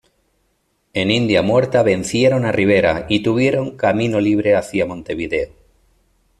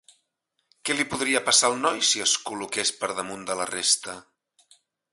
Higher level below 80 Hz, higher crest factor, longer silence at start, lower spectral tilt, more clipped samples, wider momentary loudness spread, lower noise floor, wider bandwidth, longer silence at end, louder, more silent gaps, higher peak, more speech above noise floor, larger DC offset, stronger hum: first, -46 dBFS vs -66 dBFS; second, 14 dB vs 22 dB; about the same, 0.95 s vs 0.85 s; first, -6 dB/octave vs -0.5 dB/octave; neither; second, 8 LU vs 12 LU; second, -65 dBFS vs -77 dBFS; about the same, 12.5 kHz vs 12 kHz; about the same, 0.95 s vs 0.9 s; first, -17 LUFS vs -23 LUFS; neither; about the same, -2 dBFS vs -4 dBFS; about the same, 49 dB vs 52 dB; neither; neither